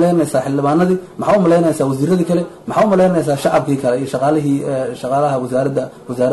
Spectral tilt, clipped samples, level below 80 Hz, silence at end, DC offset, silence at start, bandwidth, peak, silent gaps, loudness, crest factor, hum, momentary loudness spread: -7 dB/octave; under 0.1%; -52 dBFS; 0 s; under 0.1%; 0 s; 12.5 kHz; -4 dBFS; none; -16 LUFS; 10 dB; none; 7 LU